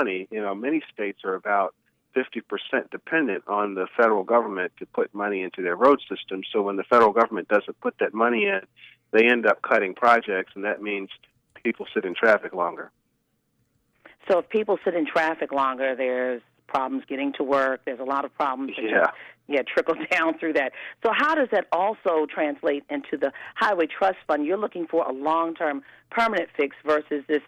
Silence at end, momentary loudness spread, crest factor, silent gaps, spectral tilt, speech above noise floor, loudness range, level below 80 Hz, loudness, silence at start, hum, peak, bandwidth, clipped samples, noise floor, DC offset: 0.05 s; 10 LU; 18 dB; none; -5.5 dB/octave; 48 dB; 5 LU; -72 dBFS; -24 LUFS; 0 s; none; -6 dBFS; 10 kHz; under 0.1%; -72 dBFS; under 0.1%